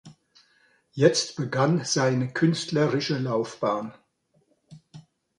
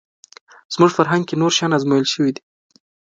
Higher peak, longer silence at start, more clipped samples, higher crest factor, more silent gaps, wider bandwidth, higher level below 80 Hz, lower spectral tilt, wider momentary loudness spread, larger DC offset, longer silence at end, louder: second, -6 dBFS vs 0 dBFS; second, 0.05 s vs 0.7 s; neither; about the same, 22 dB vs 18 dB; neither; first, 11 kHz vs 9 kHz; about the same, -68 dBFS vs -66 dBFS; about the same, -5 dB/octave vs -4.5 dB/octave; about the same, 7 LU vs 7 LU; neither; second, 0.4 s vs 0.8 s; second, -25 LUFS vs -17 LUFS